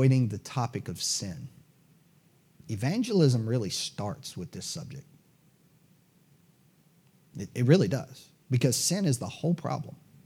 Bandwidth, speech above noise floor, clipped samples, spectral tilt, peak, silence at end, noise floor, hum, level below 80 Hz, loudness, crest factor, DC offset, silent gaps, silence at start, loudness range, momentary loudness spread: 16 kHz; 35 dB; under 0.1%; -5.5 dB/octave; -8 dBFS; 0.35 s; -63 dBFS; none; -72 dBFS; -29 LUFS; 22 dB; under 0.1%; none; 0 s; 13 LU; 19 LU